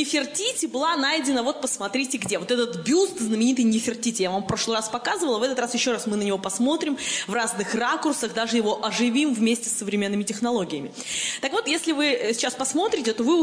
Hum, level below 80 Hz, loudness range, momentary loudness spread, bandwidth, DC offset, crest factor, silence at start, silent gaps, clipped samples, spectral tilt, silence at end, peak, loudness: none; -62 dBFS; 1 LU; 4 LU; 10.5 kHz; under 0.1%; 12 dB; 0 s; none; under 0.1%; -3 dB/octave; 0 s; -12 dBFS; -24 LUFS